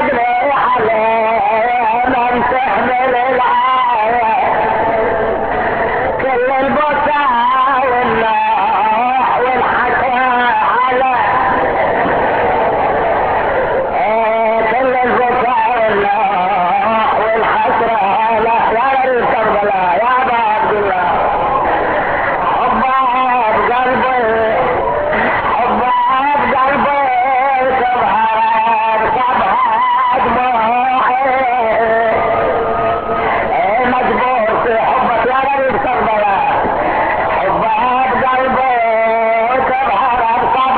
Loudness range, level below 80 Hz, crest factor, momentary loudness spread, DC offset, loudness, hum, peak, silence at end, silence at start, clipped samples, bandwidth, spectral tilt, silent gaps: 1 LU; -40 dBFS; 12 dB; 2 LU; under 0.1%; -13 LUFS; none; 0 dBFS; 0 s; 0 s; under 0.1%; 4.8 kHz; -8 dB/octave; none